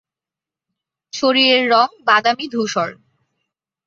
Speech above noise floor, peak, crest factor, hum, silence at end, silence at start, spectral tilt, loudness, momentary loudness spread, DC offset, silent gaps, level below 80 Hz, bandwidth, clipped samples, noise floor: 72 dB; -2 dBFS; 18 dB; none; 0.95 s; 1.15 s; -3 dB/octave; -16 LUFS; 10 LU; under 0.1%; none; -68 dBFS; 7.6 kHz; under 0.1%; -88 dBFS